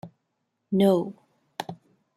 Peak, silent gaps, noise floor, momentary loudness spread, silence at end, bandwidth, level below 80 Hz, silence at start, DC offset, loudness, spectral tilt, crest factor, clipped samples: -10 dBFS; none; -78 dBFS; 18 LU; 0.4 s; 14 kHz; -70 dBFS; 0.05 s; under 0.1%; -23 LUFS; -7.5 dB/octave; 18 dB; under 0.1%